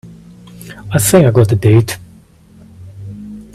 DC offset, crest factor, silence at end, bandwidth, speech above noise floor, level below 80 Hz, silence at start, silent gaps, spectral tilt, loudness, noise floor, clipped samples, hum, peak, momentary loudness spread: under 0.1%; 14 dB; 0.1 s; 15.5 kHz; 32 dB; -42 dBFS; 0.05 s; none; -6 dB/octave; -11 LUFS; -43 dBFS; under 0.1%; none; 0 dBFS; 24 LU